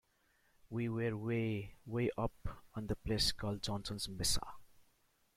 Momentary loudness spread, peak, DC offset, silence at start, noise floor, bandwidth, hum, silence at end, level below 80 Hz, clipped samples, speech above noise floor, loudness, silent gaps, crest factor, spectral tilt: 12 LU; -20 dBFS; under 0.1%; 0.65 s; -75 dBFS; 16 kHz; none; 0.55 s; -52 dBFS; under 0.1%; 36 dB; -39 LUFS; none; 20 dB; -4.5 dB/octave